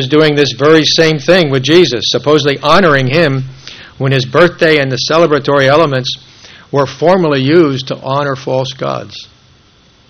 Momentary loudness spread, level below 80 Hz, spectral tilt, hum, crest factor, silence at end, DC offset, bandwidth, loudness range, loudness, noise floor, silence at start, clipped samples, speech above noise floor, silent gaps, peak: 11 LU; -46 dBFS; -5 dB/octave; none; 10 dB; 0.85 s; under 0.1%; 11.5 kHz; 4 LU; -10 LUFS; -46 dBFS; 0 s; 0.7%; 36 dB; none; 0 dBFS